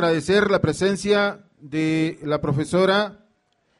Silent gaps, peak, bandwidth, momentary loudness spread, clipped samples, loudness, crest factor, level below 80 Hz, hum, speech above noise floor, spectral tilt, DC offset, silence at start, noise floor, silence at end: none; -6 dBFS; 11.5 kHz; 7 LU; under 0.1%; -21 LUFS; 14 dB; -52 dBFS; none; 46 dB; -5.5 dB/octave; under 0.1%; 0 s; -66 dBFS; 0.65 s